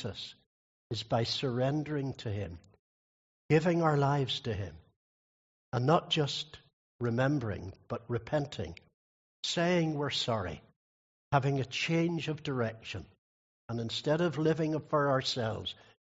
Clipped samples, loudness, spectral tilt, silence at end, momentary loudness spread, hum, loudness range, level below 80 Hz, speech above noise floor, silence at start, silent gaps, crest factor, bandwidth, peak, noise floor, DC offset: under 0.1%; -32 LUFS; -4.5 dB/octave; 0.45 s; 14 LU; none; 3 LU; -64 dBFS; over 58 dB; 0 s; 0.46-0.90 s, 2.79-3.49 s, 4.96-5.72 s, 6.73-6.99 s, 8.94-9.43 s, 10.76-11.31 s, 13.18-13.69 s; 22 dB; 8 kHz; -10 dBFS; under -90 dBFS; under 0.1%